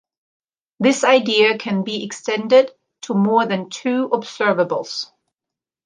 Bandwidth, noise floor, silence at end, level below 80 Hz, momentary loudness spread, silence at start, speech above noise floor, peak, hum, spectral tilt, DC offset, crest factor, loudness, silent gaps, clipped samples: 9.8 kHz; -87 dBFS; 0.8 s; -72 dBFS; 11 LU; 0.8 s; 69 dB; -2 dBFS; none; -4.5 dB/octave; under 0.1%; 18 dB; -18 LUFS; none; under 0.1%